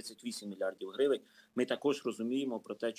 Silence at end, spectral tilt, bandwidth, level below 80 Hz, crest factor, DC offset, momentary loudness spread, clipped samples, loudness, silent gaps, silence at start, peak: 0.05 s; -4.5 dB/octave; 16 kHz; -90 dBFS; 18 dB; under 0.1%; 9 LU; under 0.1%; -36 LUFS; none; 0 s; -18 dBFS